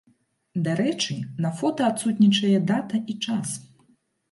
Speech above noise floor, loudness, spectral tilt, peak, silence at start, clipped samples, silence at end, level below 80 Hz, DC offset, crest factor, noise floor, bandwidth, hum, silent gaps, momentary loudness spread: 42 dB; -24 LUFS; -5 dB/octave; -10 dBFS; 0.55 s; under 0.1%; 0.65 s; -70 dBFS; under 0.1%; 16 dB; -65 dBFS; 11.5 kHz; none; none; 10 LU